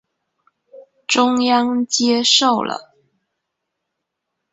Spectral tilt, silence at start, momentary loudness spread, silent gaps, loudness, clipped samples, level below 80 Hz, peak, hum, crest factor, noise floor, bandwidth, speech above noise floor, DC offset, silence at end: -1.5 dB/octave; 0.75 s; 13 LU; none; -16 LUFS; under 0.1%; -66 dBFS; 0 dBFS; none; 20 dB; -78 dBFS; 8.2 kHz; 62 dB; under 0.1%; 1.7 s